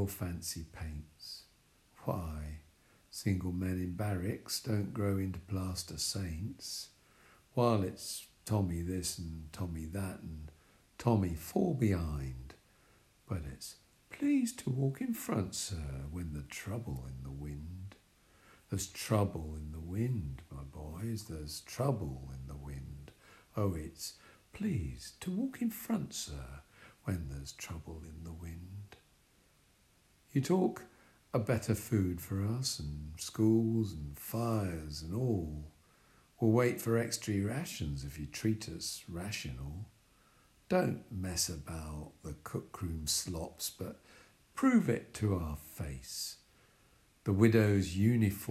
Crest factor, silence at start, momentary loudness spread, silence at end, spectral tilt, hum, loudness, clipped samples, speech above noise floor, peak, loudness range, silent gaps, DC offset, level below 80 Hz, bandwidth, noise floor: 24 dB; 0 s; 17 LU; 0 s; -5.5 dB/octave; none; -36 LUFS; under 0.1%; 33 dB; -14 dBFS; 7 LU; none; under 0.1%; -52 dBFS; 16 kHz; -68 dBFS